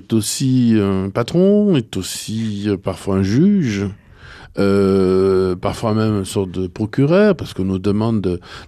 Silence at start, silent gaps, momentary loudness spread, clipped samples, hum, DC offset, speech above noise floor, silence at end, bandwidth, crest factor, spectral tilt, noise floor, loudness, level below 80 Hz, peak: 0.1 s; none; 9 LU; under 0.1%; none; under 0.1%; 24 dB; 0 s; 14.5 kHz; 14 dB; -6.5 dB/octave; -40 dBFS; -17 LUFS; -46 dBFS; -4 dBFS